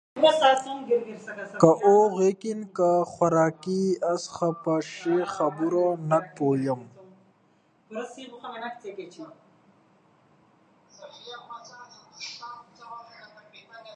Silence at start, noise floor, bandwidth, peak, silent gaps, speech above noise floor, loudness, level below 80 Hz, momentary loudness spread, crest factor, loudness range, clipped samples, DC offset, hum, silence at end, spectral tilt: 0.15 s; -64 dBFS; 10 kHz; -2 dBFS; none; 39 dB; -24 LUFS; -70 dBFS; 24 LU; 24 dB; 21 LU; under 0.1%; under 0.1%; none; 0 s; -5.5 dB/octave